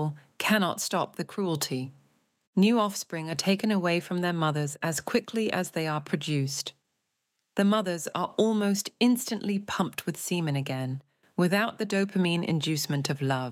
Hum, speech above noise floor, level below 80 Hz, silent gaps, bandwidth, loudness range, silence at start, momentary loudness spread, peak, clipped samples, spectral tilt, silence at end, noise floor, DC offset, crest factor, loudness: none; 52 dB; -74 dBFS; 2.47-2.53 s; 16.5 kHz; 2 LU; 0 s; 8 LU; -12 dBFS; under 0.1%; -5 dB/octave; 0 s; -80 dBFS; under 0.1%; 18 dB; -28 LUFS